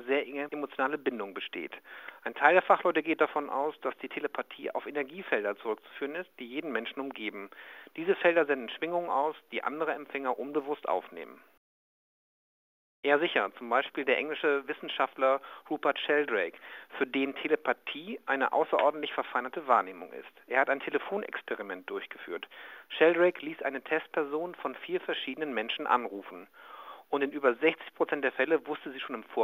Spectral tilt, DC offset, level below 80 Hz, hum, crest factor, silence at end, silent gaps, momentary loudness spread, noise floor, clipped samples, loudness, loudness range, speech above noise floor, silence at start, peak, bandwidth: -5.5 dB/octave; under 0.1%; under -90 dBFS; none; 26 dB; 0 s; 11.57-13.03 s; 14 LU; under -90 dBFS; under 0.1%; -31 LUFS; 6 LU; over 59 dB; 0 s; -6 dBFS; 16 kHz